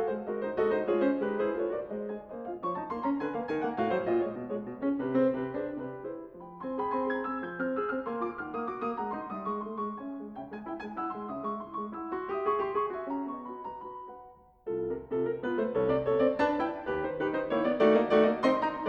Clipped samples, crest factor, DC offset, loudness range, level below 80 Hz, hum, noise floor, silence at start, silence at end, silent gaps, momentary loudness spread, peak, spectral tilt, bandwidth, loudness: under 0.1%; 18 dB; under 0.1%; 7 LU; -62 dBFS; none; -53 dBFS; 0 s; 0 s; none; 13 LU; -12 dBFS; -8 dB/octave; 7 kHz; -31 LUFS